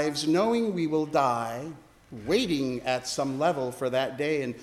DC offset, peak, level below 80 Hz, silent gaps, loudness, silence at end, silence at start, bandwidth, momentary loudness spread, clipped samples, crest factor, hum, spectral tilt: under 0.1%; -10 dBFS; -60 dBFS; none; -27 LUFS; 0 s; 0 s; 15 kHz; 9 LU; under 0.1%; 16 dB; none; -5 dB/octave